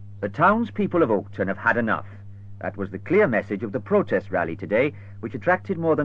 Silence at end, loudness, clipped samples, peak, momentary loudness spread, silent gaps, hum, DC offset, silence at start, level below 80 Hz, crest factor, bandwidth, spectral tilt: 0 s; -23 LUFS; under 0.1%; -6 dBFS; 14 LU; none; none; 0.4%; 0 s; -58 dBFS; 16 dB; 7 kHz; -9 dB/octave